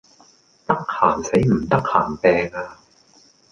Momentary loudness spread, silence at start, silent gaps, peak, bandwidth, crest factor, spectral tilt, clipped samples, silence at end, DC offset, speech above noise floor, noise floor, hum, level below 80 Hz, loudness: 13 LU; 0.7 s; none; -2 dBFS; 11 kHz; 20 dB; -6.5 dB/octave; under 0.1%; 0.8 s; under 0.1%; 35 dB; -54 dBFS; none; -46 dBFS; -19 LUFS